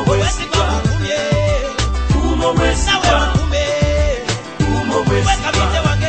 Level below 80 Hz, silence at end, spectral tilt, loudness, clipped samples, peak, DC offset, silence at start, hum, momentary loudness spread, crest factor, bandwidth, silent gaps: -20 dBFS; 0 s; -5 dB/octave; -16 LUFS; under 0.1%; -2 dBFS; 0.4%; 0 s; none; 4 LU; 14 dB; 8.8 kHz; none